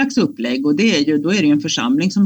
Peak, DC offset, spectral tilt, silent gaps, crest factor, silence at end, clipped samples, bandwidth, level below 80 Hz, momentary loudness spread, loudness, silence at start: -4 dBFS; under 0.1%; -5 dB/octave; none; 12 dB; 0 s; under 0.1%; 19.5 kHz; -60 dBFS; 4 LU; -16 LUFS; 0 s